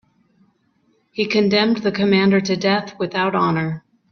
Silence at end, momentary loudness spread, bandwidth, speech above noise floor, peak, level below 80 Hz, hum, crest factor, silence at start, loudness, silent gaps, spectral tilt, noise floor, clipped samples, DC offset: 0.35 s; 9 LU; 6.8 kHz; 45 dB; -4 dBFS; -58 dBFS; none; 16 dB; 1.15 s; -18 LUFS; none; -6 dB/octave; -63 dBFS; under 0.1%; under 0.1%